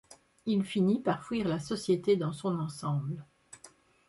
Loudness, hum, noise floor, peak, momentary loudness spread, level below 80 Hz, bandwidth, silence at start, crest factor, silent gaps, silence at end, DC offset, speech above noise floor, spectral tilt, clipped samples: -31 LUFS; none; -59 dBFS; -14 dBFS; 15 LU; -66 dBFS; 11.5 kHz; 0.1 s; 18 dB; none; 0.4 s; under 0.1%; 28 dB; -7 dB/octave; under 0.1%